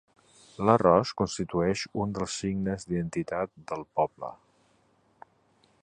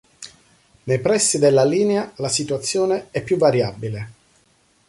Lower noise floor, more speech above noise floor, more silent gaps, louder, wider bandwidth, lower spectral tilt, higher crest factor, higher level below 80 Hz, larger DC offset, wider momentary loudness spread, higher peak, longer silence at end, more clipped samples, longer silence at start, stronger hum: first, -66 dBFS vs -60 dBFS; about the same, 39 dB vs 41 dB; neither; second, -28 LUFS vs -19 LUFS; second, 10 kHz vs 11.5 kHz; first, -6 dB/octave vs -4.5 dB/octave; first, 24 dB vs 16 dB; about the same, -56 dBFS vs -56 dBFS; neither; second, 11 LU vs 21 LU; about the same, -6 dBFS vs -4 dBFS; first, 1.45 s vs 0.75 s; neither; first, 0.6 s vs 0.2 s; neither